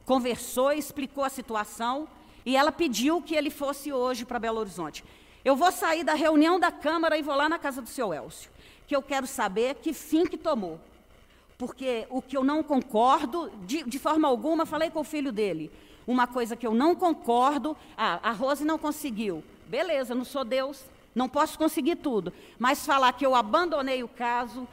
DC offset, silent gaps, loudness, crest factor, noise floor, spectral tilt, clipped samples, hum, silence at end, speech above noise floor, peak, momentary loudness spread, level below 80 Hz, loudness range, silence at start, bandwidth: under 0.1%; none; -27 LUFS; 18 dB; -57 dBFS; -4 dB/octave; under 0.1%; none; 0.05 s; 30 dB; -10 dBFS; 11 LU; -60 dBFS; 4 LU; 0.05 s; 16 kHz